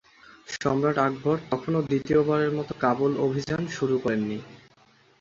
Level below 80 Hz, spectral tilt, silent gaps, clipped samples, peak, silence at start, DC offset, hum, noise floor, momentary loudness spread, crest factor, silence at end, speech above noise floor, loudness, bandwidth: -58 dBFS; -7 dB/octave; none; under 0.1%; -8 dBFS; 0.5 s; under 0.1%; none; -59 dBFS; 7 LU; 18 dB; 0.65 s; 34 dB; -26 LUFS; 7.6 kHz